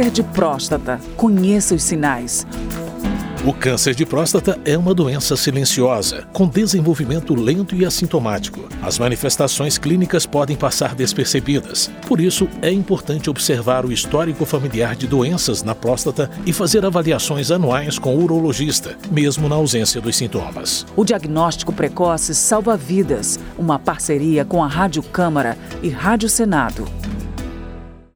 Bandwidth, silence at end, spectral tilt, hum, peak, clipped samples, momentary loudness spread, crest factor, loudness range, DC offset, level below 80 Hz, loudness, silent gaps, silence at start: over 20 kHz; 0.15 s; -4.5 dB/octave; none; -2 dBFS; under 0.1%; 7 LU; 16 dB; 2 LU; under 0.1%; -36 dBFS; -17 LUFS; none; 0 s